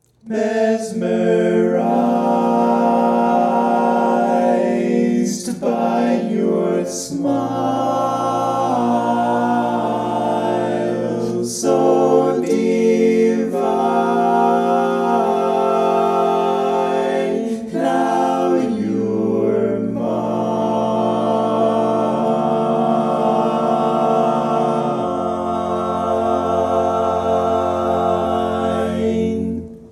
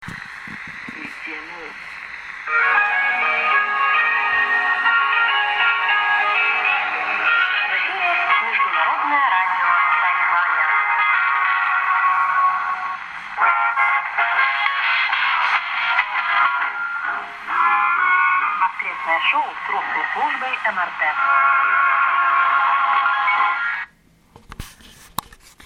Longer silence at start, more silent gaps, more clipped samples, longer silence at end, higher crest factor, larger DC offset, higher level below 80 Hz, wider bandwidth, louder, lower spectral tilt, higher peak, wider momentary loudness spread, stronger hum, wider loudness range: first, 0.25 s vs 0 s; neither; neither; second, 0 s vs 0.6 s; about the same, 16 dB vs 18 dB; neither; about the same, -52 dBFS vs -56 dBFS; second, 13 kHz vs 16 kHz; about the same, -18 LUFS vs -17 LUFS; first, -6 dB/octave vs -1.5 dB/octave; about the same, -2 dBFS vs -2 dBFS; second, 5 LU vs 15 LU; neither; about the same, 3 LU vs 3 LU